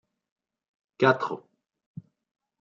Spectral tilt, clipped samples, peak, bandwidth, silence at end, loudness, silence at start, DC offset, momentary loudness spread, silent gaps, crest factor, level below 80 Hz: -6.5 dB/octave; under 0.1%; -6 dBFS; 7.2 kHz; 1.2 s; -25 LUFS; 1 s; under 0.1%; 25 LU; none; 26 dB; -76 dBFS